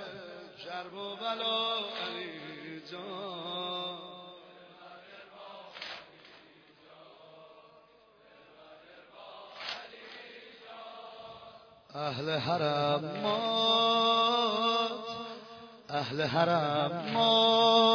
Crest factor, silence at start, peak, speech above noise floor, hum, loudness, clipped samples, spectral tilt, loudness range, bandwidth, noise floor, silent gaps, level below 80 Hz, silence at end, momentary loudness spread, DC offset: 20 dB; 0 s; -12 dBFS; 31 dB; none; -30 LUFS; under 0.1%; -5 dB/octave; 20 LU; 5.4 kHz; -61 dBFS; none; -76 dBFS; 0 s; 24 LU; under 0.1%